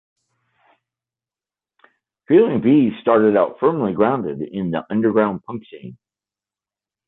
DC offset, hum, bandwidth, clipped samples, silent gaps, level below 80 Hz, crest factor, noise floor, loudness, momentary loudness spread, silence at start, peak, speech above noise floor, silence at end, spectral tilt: under 0.1%; none; 4 kHz; under 0.1%; none; -60 dBFS; 18 dB; under -90 dBFS; -18 LUFS; 16 LU; 2.3 s; -4 dBFS; over 73 dB; 1.15 s; -11 dB/octave